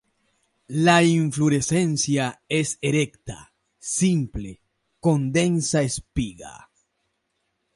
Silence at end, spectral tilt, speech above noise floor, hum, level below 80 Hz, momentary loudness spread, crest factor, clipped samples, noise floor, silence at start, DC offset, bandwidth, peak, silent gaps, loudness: 1.2 s; -5 dB/octave; 53 dB; none; -48 dBFS; 19 LU; 18 dB; under 0.1%; -75 dBFS; 0.7 s; under 0.1%; 11.5 kHz; -6 dBFS; none; -22 LUFS